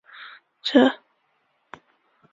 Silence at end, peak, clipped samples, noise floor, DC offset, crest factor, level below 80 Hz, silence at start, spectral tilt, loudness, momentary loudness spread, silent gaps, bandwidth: 1.4 s; -2 dBFS; under 0.1%; -69 dBFS; under 0.1%; 22 dB; -72 dBFS; 0.2 s; -4.5 dB/octave; -20 LUFS; 24 LU; none; 7.6 kHz